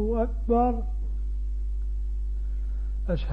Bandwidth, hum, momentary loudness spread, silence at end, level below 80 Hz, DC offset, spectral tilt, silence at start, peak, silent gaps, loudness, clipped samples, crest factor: 4.4 kHz; none; 9 LU; 0 s; -28 dBFS; 0.6%; -10 dB/octave; 0 s; -12 dBFS; none; -30 LUFS; under 0.1%; 14 dB